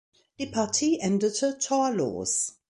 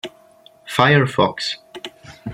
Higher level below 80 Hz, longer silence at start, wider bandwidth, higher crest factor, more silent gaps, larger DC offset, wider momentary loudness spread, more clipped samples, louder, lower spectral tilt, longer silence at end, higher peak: second, -64 dBFS vs -56 dBFS; first, 0.4 s vs 0.05 s; second, 11.5 kHz vs 14 kHz; about the same, 16 dB vs 20 dB; neither; neither; second, 5 LU vs 21 LU; neither; second, -26 LUFS vs -17 LUFS; second, -3.5 dB/octave vs -5.5 dB/octave; first, 0.2 s vs 0 s; second, -12 dBFS vs 0 dBFS